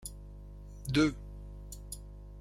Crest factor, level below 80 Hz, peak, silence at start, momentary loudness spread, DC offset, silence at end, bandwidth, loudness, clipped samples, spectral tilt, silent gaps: 22 dB; -46 dBFS; -16 dBFS; 0 s; 21 LU; under 0.1%; 0 s; 16 kHz; -34 LUFS; under 0.1%; -5 dB/octave; none